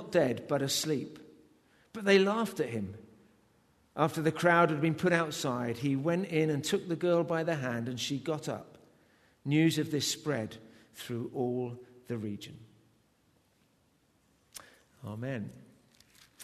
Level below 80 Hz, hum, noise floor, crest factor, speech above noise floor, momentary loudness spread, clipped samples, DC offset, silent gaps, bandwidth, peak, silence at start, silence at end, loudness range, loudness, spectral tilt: -72 dBFS; none; -70 dBFS; 22 dB; 39 dB; 20 LU; under 0.1%; under 0.1%; none; 13.5 kHz; -10 dBFS; 0 s; 0 s; 17 LU; -31 LUFS; -5 dB/octave